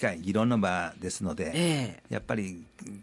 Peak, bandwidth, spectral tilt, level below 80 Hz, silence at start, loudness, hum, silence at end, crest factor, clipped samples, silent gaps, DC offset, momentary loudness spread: -14 dBFS; 11.5 kHz; -5 dB/octave; -60 dBFS; 0 s; -30 LUFS; none; 0 s; 16 dB; under 0.1%; none; under 0.1%; 12 LU